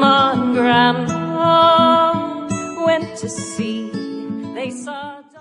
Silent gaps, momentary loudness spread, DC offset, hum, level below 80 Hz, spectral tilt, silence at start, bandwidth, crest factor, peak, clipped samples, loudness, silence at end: none; 15 LU; under 0.1%; none; -54 dBFS; -4.5 dB/octave; 0 s; 11.5 kHz; 14 dB; -2 dBFS; under 0.1%; -17 LUFS; 0 s